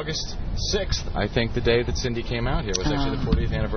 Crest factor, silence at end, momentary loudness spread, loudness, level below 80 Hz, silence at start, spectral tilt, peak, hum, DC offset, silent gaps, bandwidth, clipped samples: 20 dB; 0 s; 6 LU; -25 LUFS; -28 dBFS; 0 s; -5 dB/octave; -4 dBFS; none; under 0.1%; none; 6.6 kHz; under 0.1%